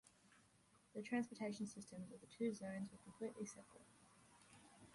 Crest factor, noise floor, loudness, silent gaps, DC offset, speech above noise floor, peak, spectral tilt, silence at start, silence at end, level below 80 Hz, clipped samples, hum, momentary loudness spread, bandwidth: 20 dB; -74 dBFS; -49 LUFS; none; under 0.1%; 25 dB; -32 dBFS; -5.5 dB/octave; 0.05 s; 0 s; -84 dBFS; under 0.1%; none; 23 LU; 11.5 kHz